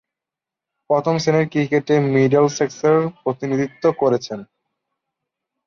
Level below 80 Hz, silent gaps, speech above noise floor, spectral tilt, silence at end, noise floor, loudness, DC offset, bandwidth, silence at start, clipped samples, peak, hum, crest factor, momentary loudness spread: -62 dBFS; none; 69 dB; -6.5 dB/octave; 1.25 s; -87 dBFS; -18 LUFS; under 0.1%; 7.2 kHz; 0.9 s; under 0.1%; -4 dBFS; none; 16 dB; 8 LU